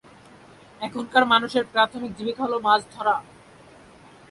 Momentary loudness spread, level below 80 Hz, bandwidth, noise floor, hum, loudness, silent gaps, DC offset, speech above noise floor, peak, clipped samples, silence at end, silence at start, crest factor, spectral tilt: 12 LU; -62 dBFS; 11.5 kHz; -49 dBFS; none; -22 LUFS; none; under 0.1%; 27 dB; -4 dBFS; under 0.1%; 1.1 s; 0.8 s; 20 dB; -4 dB/octave